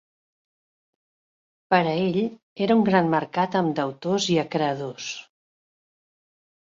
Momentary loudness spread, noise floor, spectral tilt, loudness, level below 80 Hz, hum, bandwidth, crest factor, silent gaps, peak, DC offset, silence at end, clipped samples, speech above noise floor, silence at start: 11 LU; under -90 dBFS; -5.5 dB/octave; -23 LUFS; -66 dBFS; none; 7.8 kHz; 20 dB; 2.43-2.56 s; -6 dBFS; under 0.1%; 1.45 s; under 0.1%; over 67 dB; 1.7 s